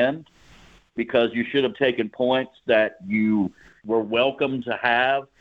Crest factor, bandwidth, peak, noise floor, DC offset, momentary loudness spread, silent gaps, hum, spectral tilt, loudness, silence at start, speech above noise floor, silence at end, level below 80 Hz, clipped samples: 18 dB; 7.2 kHz; -6 dBFS; -52 dBFS; under 0.1%; 7 LU; none; none; -7 dB/octave; -23 LUFS; 0 s; 29 dB; 0.15 s; -62 dBFS; under 0.1%